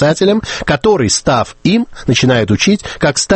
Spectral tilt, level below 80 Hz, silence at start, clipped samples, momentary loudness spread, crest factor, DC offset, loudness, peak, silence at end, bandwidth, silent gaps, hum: -4.5 dB/octave; -36 dBFS; 0 s; under 0.1%; 4 LU; 12 dB; under 0.1%; -13 LUFS; 0 dBFS; 0 s; 8.8 kHz; none; none